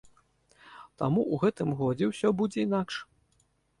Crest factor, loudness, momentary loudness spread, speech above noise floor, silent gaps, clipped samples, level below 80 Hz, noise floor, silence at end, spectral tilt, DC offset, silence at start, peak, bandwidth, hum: 16 dB; -29 LUFS; 11 LU; 42 dB; none; under 0.1%; -64 dBFS; -70 dBFS; 0.75 s; -7 dB/octave; under 0.1%; 0.65 s; -14 dBFS; 11.5 kHz; none